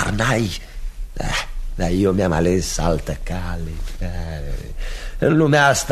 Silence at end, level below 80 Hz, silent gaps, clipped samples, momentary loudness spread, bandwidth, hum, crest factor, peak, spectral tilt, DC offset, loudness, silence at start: 0 s; -28 dBFS; none; under 0.1%; 17 LU; 13.5 kHz; none; 18 dB; -2 dBFS; -5 dB/octave; under 0.1%; -20 LUFS; 0 s